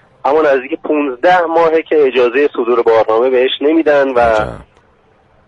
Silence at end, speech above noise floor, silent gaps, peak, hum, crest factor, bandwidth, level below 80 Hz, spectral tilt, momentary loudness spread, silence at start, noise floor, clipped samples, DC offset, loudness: 0.85 s; 39 dB; none; 0 dBFS; none; 12 dB; 7.8 kHz; -42 dBFS; -6 dB/octave; 5 LU; 0.25 s; -51 dBFS; under 0.1%; under 0.1%; -12 LUFS